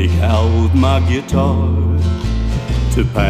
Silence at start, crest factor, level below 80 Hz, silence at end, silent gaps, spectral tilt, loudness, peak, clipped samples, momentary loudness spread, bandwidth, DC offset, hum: 0 s; 12 dB; -20 dBFS; 0 s; none; -7 dB/octave; -15 LUFS; -2 dBFS; under 0.1%; 6 LU; 9.4 kHz; under 0.1%; none